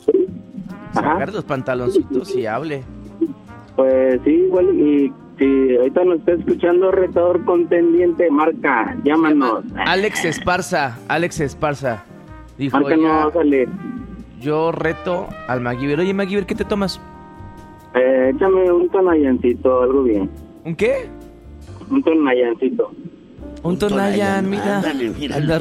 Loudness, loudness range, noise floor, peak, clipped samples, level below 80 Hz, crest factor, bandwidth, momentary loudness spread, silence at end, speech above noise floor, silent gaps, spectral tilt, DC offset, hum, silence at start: -18 LUFS; 5 LU; -38 dBFS; -2 dBFS; under 0.1%; -44 dBFS; 16 dB; 13 kHz; 13 LU; 0 s; 21 dB; none; -6.5 dB/octave; under 0.1%; none; 0.05 s